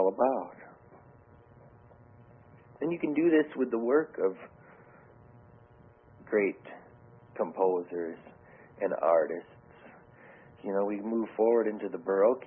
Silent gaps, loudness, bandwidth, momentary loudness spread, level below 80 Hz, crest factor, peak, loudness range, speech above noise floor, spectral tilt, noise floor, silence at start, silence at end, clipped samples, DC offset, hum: none; -30 LUFS; 3.6 kHz; 20 LU; -70 dBFS; 18 dB; -12 dBFS; 4 LU; 29 dB; -10.5 dB/octave; -57 dBFS; 0 s; 0 s; under 0.1%; under 0.1%; none